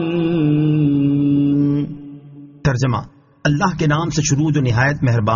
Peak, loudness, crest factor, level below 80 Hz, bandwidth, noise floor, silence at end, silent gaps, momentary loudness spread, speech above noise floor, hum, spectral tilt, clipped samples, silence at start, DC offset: -4 dBFS; -17 LUFS; 14 dB; -42 dBFS; 7.4 kHz; -39 dBFS; 0 s; none; 7 LU; 22 dB; none; -6.5 dB/octave; under 0.1%; 0 s; under 0.1%